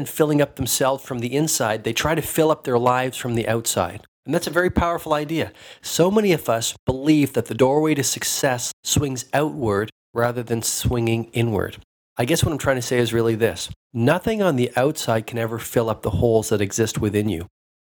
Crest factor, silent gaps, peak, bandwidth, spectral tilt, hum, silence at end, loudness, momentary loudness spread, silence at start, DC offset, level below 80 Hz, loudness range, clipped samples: 18 dB; 4.08-4.23 s, 6.79-6.87 s, 8.73-8.83 s, 9.92-10.13 s, 11.84-12.16 s, 13.76-13.90 s; -4 dBFS; 20 kHz; -4.5 dB/octave; none; 0.35 s; -21 LUFS; 7 LU; 0 s; under 0.1%; -44 dBFS; 2 LU; under 0.1%